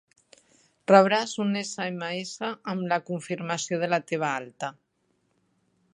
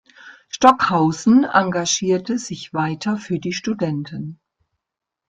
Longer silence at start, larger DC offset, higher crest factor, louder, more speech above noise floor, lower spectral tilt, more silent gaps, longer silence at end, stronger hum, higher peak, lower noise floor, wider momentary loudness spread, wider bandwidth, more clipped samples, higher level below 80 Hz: first, 0.9 s vs 0.25 s; neither; first, 26 dB vs 20 dB; second, -26 LUFS vs -19 LUFS; second, 46 dB vs 66 dB; about the same, -4.5 dB/octave vs -4.5 dB/octave; neither; first, 1.2 s vs 0.95 s; neither; about the same, -2 dBFS vs 0 dBFS; second, -72 dBFS vs -84 dBFS; about the same, 14 LU vs 13 LU; first, 11 kHz vs 9.4 kHz; neither; second, -78 dBFS vs -58 dBFS